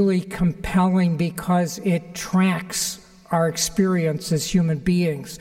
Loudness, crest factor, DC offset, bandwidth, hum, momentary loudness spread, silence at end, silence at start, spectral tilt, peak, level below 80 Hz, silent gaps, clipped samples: -22 LUFS; 14 dB; under 0.1%; 16.5 kHz; none; 5 LU; 0.05 s; 0 s; -5.5 dB/octave; -8 dBFS; -44 dBFS; none; under 0.1%